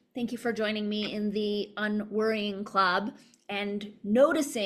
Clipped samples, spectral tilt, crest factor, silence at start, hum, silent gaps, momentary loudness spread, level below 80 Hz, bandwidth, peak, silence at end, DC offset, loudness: under 0.1%; -4.5 dB/octave; 18 dB; 0.15 s; none; none; 10 LU; -70 dBFS; 14 kHz; -10 dBFS; 0 s; under 0.1%; -29 LUFS